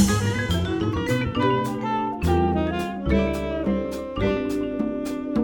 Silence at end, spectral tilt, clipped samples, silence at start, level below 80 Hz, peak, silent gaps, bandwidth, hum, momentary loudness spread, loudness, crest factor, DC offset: 0 s; -6 dB/octave; under 0.1%; 0 s; -36 dBFS; -6 dBFS; none; 17.5 kHz; none; 5 LU; -24 LUFS; 16 dB; under 0.1%